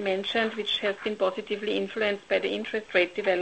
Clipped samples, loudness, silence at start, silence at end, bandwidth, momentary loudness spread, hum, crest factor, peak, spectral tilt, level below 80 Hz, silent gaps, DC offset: under 0.1%; -27 LUFS; 0 s; 0 s; 8.8 kHz; 4 LU; none; 18 dB; -10 dBFS; -4.5 dB/octave; -66 dBFS; none; under 0.1%